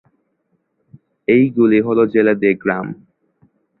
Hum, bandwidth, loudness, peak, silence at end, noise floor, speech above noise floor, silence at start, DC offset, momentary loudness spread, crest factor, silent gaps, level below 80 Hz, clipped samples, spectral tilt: none; 4.2 kHz; -15 LUFS; -2 dBFS; 0.85 s; -67 dBFS; 53 dB; 1.3 s; under 0.1%; 13 LU; 16 dB; none; -58 dBFS; under 0.1%; -11 dB/octave